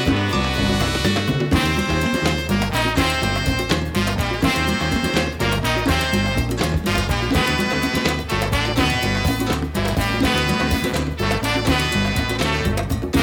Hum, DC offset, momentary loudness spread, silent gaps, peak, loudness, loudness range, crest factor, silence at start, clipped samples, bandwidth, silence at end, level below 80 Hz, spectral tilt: none; under 0.1%; 3 LU; none; -4 dBFS; -20 LUFS; 1 LU; 16 dB; 0 s; under 0.1%; 19 kHz; 0 s; -30 dBFS; -5 dB/octave